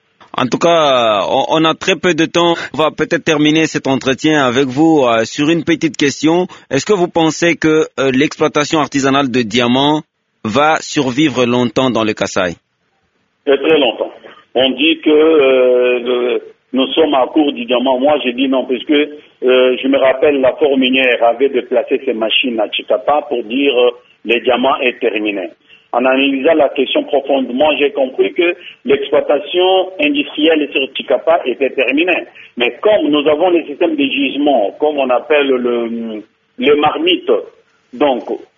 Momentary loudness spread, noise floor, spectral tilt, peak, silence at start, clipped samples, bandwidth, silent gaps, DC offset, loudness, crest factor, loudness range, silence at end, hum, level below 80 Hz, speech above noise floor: 6 LU; -62 dBFS; -2.5 dB/octave; 0 dBFS; 0.35 s; under 0.1%; 7.6 kHz; none; under 0.1%; -13 LUFS; 14 dB; 2 LU; 0.15 s; none; -54 dBFS; 49 dB